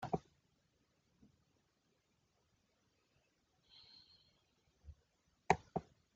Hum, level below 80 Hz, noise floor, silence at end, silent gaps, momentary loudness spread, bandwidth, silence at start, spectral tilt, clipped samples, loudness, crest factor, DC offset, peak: none; -70 dBFS; -81 dBFS; 0.35 s; none; 26 LU; 7.4 kHz; 0 s; -4.5 dB/octave; under 0.1%; -41 LUFS; 36 dB; under 0.1%; -14 dBFS